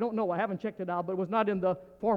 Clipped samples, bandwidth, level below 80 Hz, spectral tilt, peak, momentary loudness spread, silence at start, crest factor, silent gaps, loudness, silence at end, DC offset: under 0.1%; 6 kHz; -66 dBFS; -9 dB/octave; -14 dBFS; 5 LU; 0 s; 16 dB; none; -31 LUFS; 0 s; under 0.1%